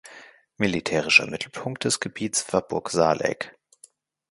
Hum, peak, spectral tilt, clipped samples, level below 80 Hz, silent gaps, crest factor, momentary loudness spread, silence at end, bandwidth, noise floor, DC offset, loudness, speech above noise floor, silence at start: none; -2 dBFS; -3 dB/octave; under 0.1%; -58 dBFS; none; 24 dB; 14 LU; 0.8 s; 11.5 kHz; -56 dBFS; under 0.1%; -23 LUFS; 32 dB; 0.05 s